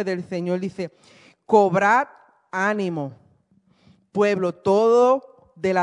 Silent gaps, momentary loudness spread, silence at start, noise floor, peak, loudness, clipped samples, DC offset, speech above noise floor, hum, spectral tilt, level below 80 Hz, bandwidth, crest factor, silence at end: none; 15 LU; 0 s; -61 dBFS; -4 dBFS; -21 LUFS; under 0.1%; under 0.1%; 40 dB; none; -6.5 dB/octave; -70 dBFS; 10.5 kHz; 18 dB; 0 s